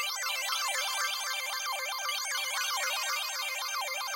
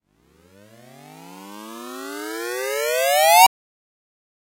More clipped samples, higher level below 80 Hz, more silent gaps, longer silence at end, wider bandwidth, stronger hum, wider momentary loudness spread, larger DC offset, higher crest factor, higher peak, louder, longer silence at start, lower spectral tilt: neither; second, under -90 dBFS vs -66 dBFS; neither; second, 0 s vs 1 s; about the same, 16.5 kHz vs 16 kHz; neither; second, 3 LU vs 25 LU; neither; second, 14 dB vs 22 dB; second, -18 dBFS vs -2 dBFS; second, -31 LUFS vs -17 LUFS; second, 0 s vs 1.2 s; second, 8 dB/octave vs 0 dB/octave